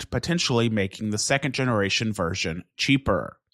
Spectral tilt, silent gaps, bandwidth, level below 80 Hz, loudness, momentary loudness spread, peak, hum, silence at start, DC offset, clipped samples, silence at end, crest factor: -4.5 dB/octave; none; 14.5 kHz; -48 dBFS; -24 LUFS; 5 LU; -6 dBFS; none; 0 s; under 0.1%; under 0.1%; 0.25 s; 18 dB